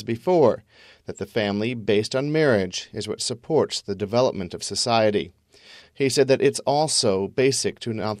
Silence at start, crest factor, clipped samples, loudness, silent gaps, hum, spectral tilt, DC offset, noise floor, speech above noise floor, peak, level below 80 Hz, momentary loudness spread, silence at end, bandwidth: 0 s; 18 dB; under 0.1%; -22 LUFS; none; none; -4 dB/octave; under 0.1%; -50 dBFS; 27 dB; -4 dBFS; -62 dBFS; 10 LU; 0 s; 14 kHz